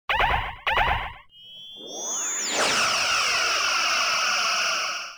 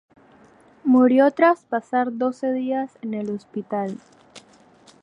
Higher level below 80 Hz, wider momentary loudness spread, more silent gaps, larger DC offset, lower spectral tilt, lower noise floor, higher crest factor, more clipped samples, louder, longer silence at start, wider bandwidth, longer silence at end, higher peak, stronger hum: first, -42 dBFS vs -72 dBFS; about the same, 13 LU vs 13 LU; neither; neither; second, 0 dB/octave vs -7 dB/octave; second, -45 dBFS vs -52 dBFS; about the same, 16 dB vs 18 dB; neither; about the same, -22 LUFS vs -21 LUFS; second, 0.1 s vs 0.85 s; first, over 20 kHz vs 8 kHz; second, 0 s vs 0.65 s; second, -10 dBFS vs -4 dBFS; neither